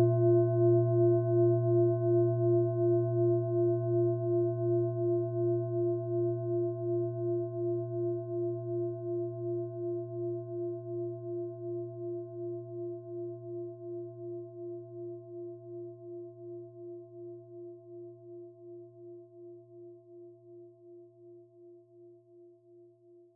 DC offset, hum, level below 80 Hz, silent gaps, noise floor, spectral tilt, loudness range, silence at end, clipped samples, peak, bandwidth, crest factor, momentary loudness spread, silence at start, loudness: under 0.1%; none; -78 dBFS; none; -59 dBFS; -15.5 dB/octave; 22 LU; 0.5 s; under 0.1%; -16 dBFS; 1.6 kHz; 16 dB; 22 LU; 0 s; -31 LUFS